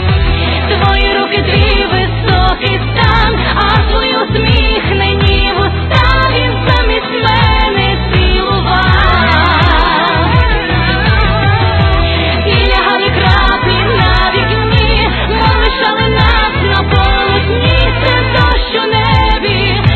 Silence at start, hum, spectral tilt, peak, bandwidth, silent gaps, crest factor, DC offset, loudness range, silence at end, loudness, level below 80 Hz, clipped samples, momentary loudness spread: 0 s; none; -7.5 dB/octave; 0 dBFS; 8 kHz; none; 10 dB; under 0.1%; 1 LU; 0 s; -10 LUFS; -16 dBFS; 0.2%; 3 LU